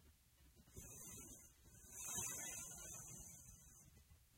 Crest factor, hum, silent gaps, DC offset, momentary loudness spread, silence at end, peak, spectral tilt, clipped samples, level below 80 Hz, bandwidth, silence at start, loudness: 22 dB; none; none; under 0.1%; 20 LU; 0 s; -34 dBFS; -1.5 dB/octave; under 0.1%; -70 dBFS; 16 kHz; 0 s; -51 LUFS